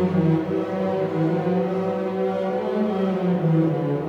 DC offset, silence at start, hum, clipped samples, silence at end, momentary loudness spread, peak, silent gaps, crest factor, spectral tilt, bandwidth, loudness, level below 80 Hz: under 0.1%; 0 s; none; under 0.1%; 0 s; 4 LU; -8 dBFS; none; 12 dB; -9.5 dB/octave; 6.6 kHz; -23 LUFS; -62 dBFS